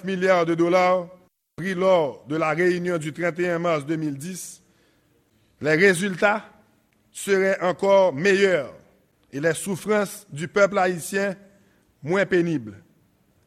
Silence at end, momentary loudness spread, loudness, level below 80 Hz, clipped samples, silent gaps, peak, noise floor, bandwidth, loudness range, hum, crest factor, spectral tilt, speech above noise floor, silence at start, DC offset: 0.7 s; 15 LU; -22 LUFS; -66 dBFS; under 0.1%; none; -4 dBFS; -63 dBFS; 15.5 kHz; 4 LU; none; 18 dB; -5 dB/octave; 41 dB; 0.05 s; under 0.1%